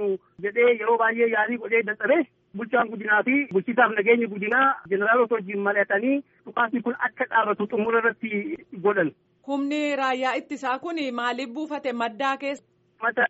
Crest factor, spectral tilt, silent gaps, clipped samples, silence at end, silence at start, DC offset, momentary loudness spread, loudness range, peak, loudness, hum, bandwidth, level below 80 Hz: 18 dB; -3 dB/octave; none; under 0.1%; 0 s; 0 s; under 0.1%; 9 LU; 5 LU; -6 dBFS; -24 LUFS; none; 8 kHz; -76 dBFS